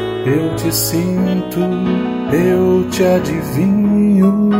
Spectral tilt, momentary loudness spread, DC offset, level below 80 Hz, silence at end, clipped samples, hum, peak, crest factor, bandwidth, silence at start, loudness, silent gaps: -6 dB/octave; 5 LU; under 0.1%; -42 dBFS; 0 s; under 0.1%; none; -2 dBFS; 12 dB; 16.5 kHz; 0 s; -15 LUFS; none